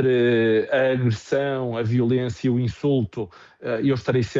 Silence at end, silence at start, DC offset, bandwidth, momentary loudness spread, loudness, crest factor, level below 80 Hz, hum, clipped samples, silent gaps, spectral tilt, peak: 0 s; 0 s; under 0.1%; 7.8 kHz; 10 LU; -22 LUFS; 14 dB; -54 dBFS; none; under 0.1%; none; -7.5 dB/octave; -8 dBFS